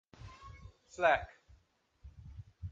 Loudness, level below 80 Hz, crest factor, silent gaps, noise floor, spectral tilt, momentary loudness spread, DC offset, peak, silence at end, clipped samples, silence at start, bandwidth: -32 LUFS; -56 dBFS; 24 dB; none; -71 dBFS; -5 dB/octave; 25 LU; under 0.1%; -14 dBFS; 0 s; under 0.1%; 0.2 s; 7.8 kHz